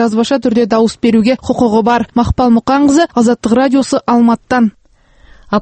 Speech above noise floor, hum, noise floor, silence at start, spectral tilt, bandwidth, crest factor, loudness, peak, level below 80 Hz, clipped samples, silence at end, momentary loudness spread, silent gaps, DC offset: 35 dB; none; -45 dBFS; 0 s; -5.5 dB/octave; 8.8 kHz; 12 dB; -11 LUFS; 0 dBFS; -34 dBFS; under 0.1%; 0 s; 3 LU; none; under 0.1%